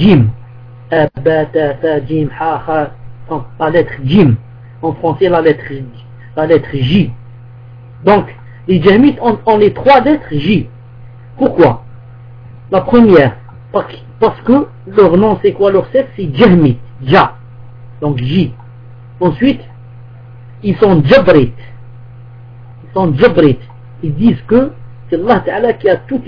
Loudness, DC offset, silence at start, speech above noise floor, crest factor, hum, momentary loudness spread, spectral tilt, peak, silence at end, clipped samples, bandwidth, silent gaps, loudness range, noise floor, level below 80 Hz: -11 LUFS; under 0.1%; 0 s; 23 dB; 12 dB; none; 13 LU; -9.5 dB/octave; 0 dBFS; 0 s; 0.5%; 5.4 kHz; none; 4 LU; -33 dBFS; -36 dBFS